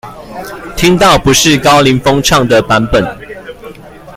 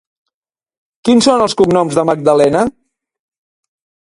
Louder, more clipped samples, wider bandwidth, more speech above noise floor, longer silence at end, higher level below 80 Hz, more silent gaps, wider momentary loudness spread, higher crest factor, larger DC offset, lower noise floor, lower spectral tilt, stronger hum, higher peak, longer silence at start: first, -8 LUFS vs -12 LUFS; first, 0.2% vs under 0.1%; first, 17 kHz vs 11.5 kHz; second, 22 dB vs 73 dB; second, 0 s vs 1.35 s; first, -30 dBFS vs -50 dBFS; neither; first, 21 LU vs 7 LU; about the same, 10 dB vs 14 dB; neither; second, -31 dBFS vs -84 dBFS; about the same, -4 dB/octave vs -5 dB/octave; neither; about the same, 0 dBFS vs 0 dBFS; second, 0.05 s vs 1.05 s